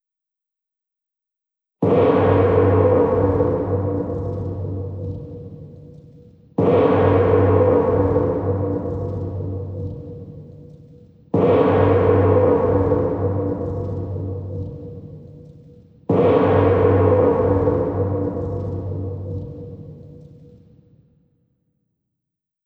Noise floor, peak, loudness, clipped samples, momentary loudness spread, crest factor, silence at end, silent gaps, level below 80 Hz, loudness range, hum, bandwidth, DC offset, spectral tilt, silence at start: -86 dBFS; -2 dBFS; -19 LUFS; under 0.1%; 20 LU; 18 dB; 2.45 s; none; -42 dBFS; 9 LU; none; 4.4 kHz; under 0.1%; -11 dB/octave; 1.8 s